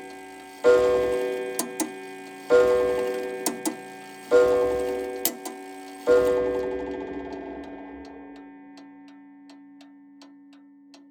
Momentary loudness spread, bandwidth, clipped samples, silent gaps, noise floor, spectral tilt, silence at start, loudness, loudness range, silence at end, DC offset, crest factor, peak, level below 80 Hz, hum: 22 LU; over 20 kHz; under 0.1%; none; -51 dBFS; -3.5 dB/octave; 0 s; -24 LUFS; 17 LU; 0.85 s; under 0.1%; 22 dB; -4 dBFS; -54 dBFS; none